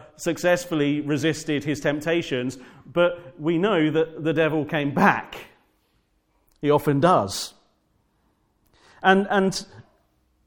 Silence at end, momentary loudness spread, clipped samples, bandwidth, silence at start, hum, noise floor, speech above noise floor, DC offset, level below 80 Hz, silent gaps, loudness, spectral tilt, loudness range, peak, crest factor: 0.65 s; 10 LU; under 0.1%; 17.5 kHz; 0 s; none; -67 dBFS; 45 dB; under 0.1%; -58 dBFS; none; -23 LUFS; -5.5 dB/octave; 3 LU; -2 dBFS; 22 dB